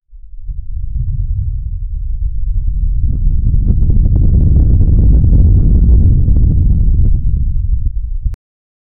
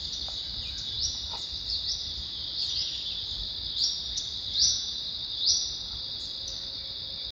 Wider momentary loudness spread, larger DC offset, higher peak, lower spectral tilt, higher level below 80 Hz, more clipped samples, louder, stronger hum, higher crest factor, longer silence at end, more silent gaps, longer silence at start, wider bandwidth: first, 13 LU vs 9 LU; neither; first, -2 dBFS vs -12 dBFS; first, -14.5 dB/octave vs 0 dB/octave; first, -12 dBFS vs -50 dBFS; neither; first, -14 LUFS vs -29 LUFS; neither; second, 8 dB vs 20 dB; first, 0.65 s vs 0 s; neither; about the same, 0.1 s vs 0 s; second, 1 kHz vs over 20 kHz